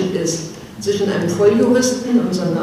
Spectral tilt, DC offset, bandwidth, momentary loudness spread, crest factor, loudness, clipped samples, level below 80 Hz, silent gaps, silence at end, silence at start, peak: -5 dB/octave; under 0.1%; 15 kHz; 11 LU; 16 dB; -17 LUFS; under 0.1%; -52 dBFS; none; 0 s; 0 s; -2 dBFS